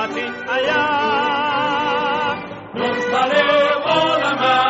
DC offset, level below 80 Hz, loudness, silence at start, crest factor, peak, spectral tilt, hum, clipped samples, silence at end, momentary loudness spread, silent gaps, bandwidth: under 0.1%; -56 dBFS; -18 LUFS; 0 s; 14 dB; -4 dBFS; -1 dB/octave; none; under 0.1%; 0 s; 8 LU; none; 8 kHz